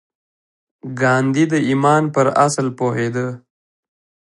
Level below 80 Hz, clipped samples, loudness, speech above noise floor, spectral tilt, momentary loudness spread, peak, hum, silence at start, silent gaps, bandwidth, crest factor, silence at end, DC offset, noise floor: -64 dBFS; under 0.1%; -17 LUFS; over 74 dB; -6 dB/octave; 13 LU; -2 dBFS; none; 0.85 s; none; 11.5 kHz; 18 dB; 0.95 s; under 0.1%; under -90 dBFS